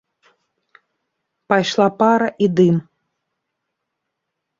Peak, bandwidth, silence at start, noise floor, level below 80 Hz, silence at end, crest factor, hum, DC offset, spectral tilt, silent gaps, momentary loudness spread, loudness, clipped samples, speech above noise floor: -2 dBFS; 7.6 kHz; 1.5 s; -78 dBFS; -62 dBFS; 1.8 s; 18 dB; none; under 0.1%; -6.5 dB/octave; none; 4 LU; -17 LUFS; under 0.1%; 63 dB